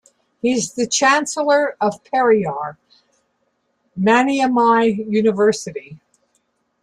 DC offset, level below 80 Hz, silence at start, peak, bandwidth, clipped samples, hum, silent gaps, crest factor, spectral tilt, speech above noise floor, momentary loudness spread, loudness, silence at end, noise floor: under 0.1%; -62 dBFS; 0.45 s; -4 dBFS; 12 kHz; under 0.1%; none; none; 16 dB; -4 dB/octave; 51 dB; 12 LU; -17 LUFS; 0.85 s; -68 dBFS